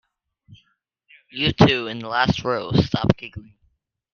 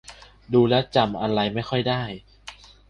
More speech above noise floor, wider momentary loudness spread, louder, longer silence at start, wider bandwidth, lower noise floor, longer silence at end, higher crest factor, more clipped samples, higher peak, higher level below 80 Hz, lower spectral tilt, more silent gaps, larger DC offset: first, 48 dB vs 23 dB; second, 16 LU vs 22 LU; about the same, -20 LUFS vs -22 LUFS; first, 0.5 s vs 0.1 s; second, 7 kHz vs 10.5 kHz; first, -68 dBFS vs -45 dBFS; first, 0.7 s vs 0.35 s; about the same, 22 dB vs 18 dB; neither; first, 0 dBFS vs -6 dBFS; first, -46 dBFS vs -52 dBFS; about the same, -6.5 dB/octave vs -7 dB/octave; neither; neither